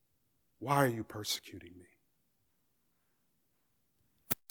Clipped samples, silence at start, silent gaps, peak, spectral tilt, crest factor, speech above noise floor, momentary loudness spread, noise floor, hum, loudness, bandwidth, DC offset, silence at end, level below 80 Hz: under 0.1%; 0.6 s; none; -12 dBFS; -4.5 dB/octave; 28 dB; 44 dB; 19 LU; -79 dBFS; none; -34 LUFS; 19.5 kHz; under 0.1%; 0.15 s; -76 dBFS